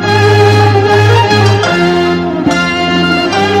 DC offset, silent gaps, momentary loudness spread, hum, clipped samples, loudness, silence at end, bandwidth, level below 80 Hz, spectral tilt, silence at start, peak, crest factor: 0.3%; none; 4 LU; none; under 0.1%; -9 LUFS; 0 s; 12 kHz; -38 dBFS; -6 dB/octave; 0 s; 0 dBFS; 8 dB